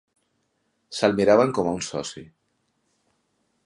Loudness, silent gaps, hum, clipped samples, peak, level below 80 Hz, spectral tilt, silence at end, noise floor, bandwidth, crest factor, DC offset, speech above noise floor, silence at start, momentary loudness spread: -22 LUFS; none; none; under 0.1%; -4 dBFS; -60 dBFS; -5 dB/octave; 1.4 s; -72 dBFS; 11.5 kHz; 22 dB; under 0.1%; 50 dB; 0.9 s; 18 LU